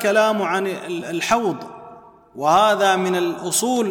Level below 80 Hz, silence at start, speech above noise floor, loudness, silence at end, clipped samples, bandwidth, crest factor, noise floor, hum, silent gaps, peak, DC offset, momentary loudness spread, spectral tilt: -62 dBFS; 0 s; 25 dB; -19 LUFS; 0 s; under 0.1%; 19 kHz; 16 dB; -44 dBFS; none; none; -4 dBFS; under 0.1%; 11 LU; -3.5 dB/octave